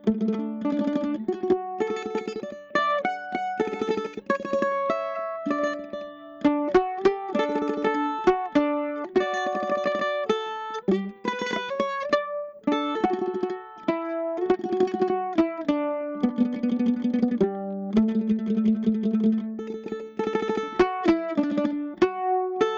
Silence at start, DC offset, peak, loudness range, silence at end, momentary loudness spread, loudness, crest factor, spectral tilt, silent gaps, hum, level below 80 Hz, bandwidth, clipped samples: 0.05 s; under 0.1%; -10 dBFS; 3 LU; 0 s; 7 LU; -26 LUFS; 16 dB; -6.5 dB/octave; none; none; -58 dBFS; 7.4 kHz; under 0.1%